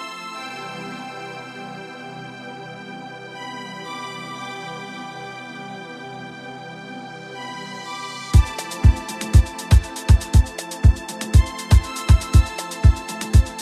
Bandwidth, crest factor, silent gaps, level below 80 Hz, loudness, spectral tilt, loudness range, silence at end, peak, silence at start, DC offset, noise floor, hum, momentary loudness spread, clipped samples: 14 kHz; 18 dB; none; -22 dBFS; -21 LUFS; -5.5 dB/octave; 15 LU; 0 s; -2 dBFS; 0 s; under 0.1%; -35 dBFS; none; 17 LU; under 0.1%